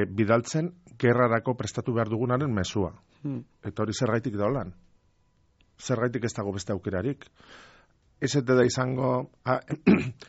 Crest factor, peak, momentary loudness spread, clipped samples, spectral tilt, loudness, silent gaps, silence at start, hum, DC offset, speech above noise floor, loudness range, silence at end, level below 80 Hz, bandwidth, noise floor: 20 dB; -8 dBFS; 13 LU; under 0.1%; -6 dB/octave; -27 LUFS; none; 0 s; none; under 0.1%; 39 dB; 6 LU; 0.05 s; -56 dBFS; 8 kHz; -66 dBFS